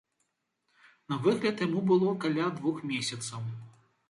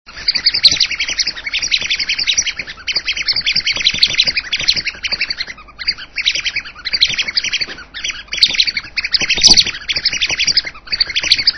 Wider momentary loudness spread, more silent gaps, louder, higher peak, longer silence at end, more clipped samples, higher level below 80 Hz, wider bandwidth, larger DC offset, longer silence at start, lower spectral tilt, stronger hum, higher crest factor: about the same, 12 LU vs 11 LU; neither; second, -30 LUFS vs -13 LUFS; second, -12 dBFS vs 0 dBFS; first, 0.4 s vs 0 s; second, under 0.1% vs 0.2%; second, -74 dBFS vs -40 dBFS; about the same, 11.5 kHz vs 11 kHz; second, under 0.1% vs 0.4%; first, 1.1 s vs 0.1 s; first, -5.5 dB/octave vs 1 dB/octave; neither; about the same, 18 dB vs 16 dB